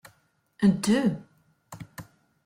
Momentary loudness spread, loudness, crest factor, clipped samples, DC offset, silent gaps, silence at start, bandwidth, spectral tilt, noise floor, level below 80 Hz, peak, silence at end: 22 LU; -24 LUFS; 18 dB; under 0.1%; under 0.1%; none; 0.6 s; 15.5 kHz; -6 dB/octave; -66 dBFS; -62 dBFS; -10 dBFS; 0.45 s